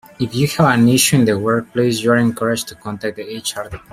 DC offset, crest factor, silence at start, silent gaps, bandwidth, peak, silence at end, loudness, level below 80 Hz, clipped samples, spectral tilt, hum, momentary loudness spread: under 0.1%; 16 dB; 0.2 s; none; 16 kHz; 0 dBFS; 0.15 s; -16 LUFS; -50 dBFS; under 0.1%; -4.5 dB/octave; none; 13 LU